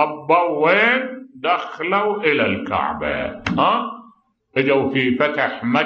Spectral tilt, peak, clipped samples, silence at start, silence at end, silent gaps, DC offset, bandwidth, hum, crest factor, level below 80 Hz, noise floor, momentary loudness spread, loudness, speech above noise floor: -6.5 dB/octave; -2 dBFS; under 0.1%; 0 s; 0 s; none; under 0.1%; 7 kHz; none; 16 dB; -50 dBFS; -52 dBFS; 9 LU; -19 LUFS; 34 dB